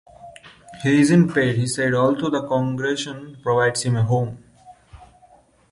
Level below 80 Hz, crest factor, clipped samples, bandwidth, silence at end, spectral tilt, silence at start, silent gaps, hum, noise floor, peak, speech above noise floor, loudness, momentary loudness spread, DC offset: -54 dBFS; 16 dB; under 0.1%; 11.5 kHz; 0.75 s; -6 dB/octave; 0.2 s; none; none; -54 dBFS; -4 dBFS; 34 dB; -20 LUFS; 11 LU; under 0.1%